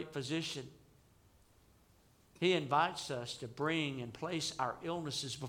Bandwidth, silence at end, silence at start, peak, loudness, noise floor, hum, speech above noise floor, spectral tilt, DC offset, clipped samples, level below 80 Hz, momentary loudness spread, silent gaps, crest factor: 17 kHz; 0 s; 0 s; -18 dBFS; -37 LUFS; -67 dBFS; none; 30 dB; -4 dB/octave; under 0.1%; under 0.1%; -72 dBFS; 10 LU; none; 20 dB